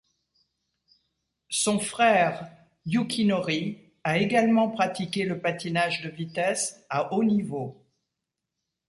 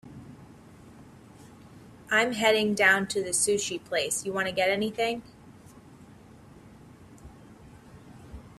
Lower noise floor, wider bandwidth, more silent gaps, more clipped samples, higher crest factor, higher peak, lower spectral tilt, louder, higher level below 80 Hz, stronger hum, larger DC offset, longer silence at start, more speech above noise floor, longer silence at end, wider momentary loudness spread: first, -85 dBFS vs -51 dBFS; second, 11.5 kHz vs 14.5 kHz; neither; neither; second, 18 dB vs 24 dB; about the same, -10 dBFS vs -8 dBFS; first, -4.5 dB/octave vs -2.5 dB/octave; about the same, -26 LUFS vs -25 LUFS; second, -66 dBFS vs -60 dBFS; neither; neither; first, 1.5 s vs 0.05 s; first, 59 dB vs 25 dB; first, 1.15 s vs 0.05 s; second, 12 LU vs 26 LU